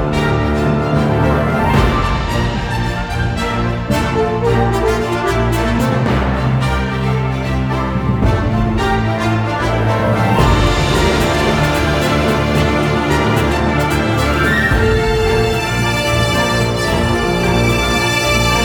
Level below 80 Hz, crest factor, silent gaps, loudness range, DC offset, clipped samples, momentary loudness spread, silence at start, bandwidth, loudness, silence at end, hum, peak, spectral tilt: -24 dBFS; 14 dB; none; 2 LU; under 0.1%; under 0.1%; 4 LU; 0 s; over 20 kHz; -15 LUFS; 0 s; none; 0 dBFS; -5.5 dB/octave